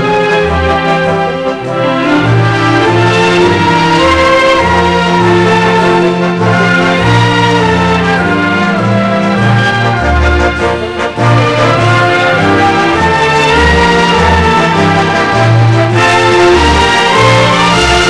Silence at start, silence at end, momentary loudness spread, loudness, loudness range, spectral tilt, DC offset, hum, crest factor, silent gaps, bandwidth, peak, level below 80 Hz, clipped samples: 0 s; 0 s; 4 LU; -8 LUFS; 2 LU; -5.5 dB/octave; 0.7%; none; 8 dB; none; 11 kHz; 0 dBFS; -24 dBFS; under 0.1%